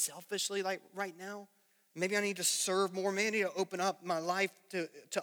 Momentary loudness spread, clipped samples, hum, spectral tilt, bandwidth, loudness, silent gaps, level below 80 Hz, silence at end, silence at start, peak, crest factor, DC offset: 10 LU; under 0.1%; none; -2.5 dB/octave; over 20 kHz; -34 LUFS; none; under -90 dBFS; 0 s; 0 s; -18 dBFS; 18 dB; under 0.1%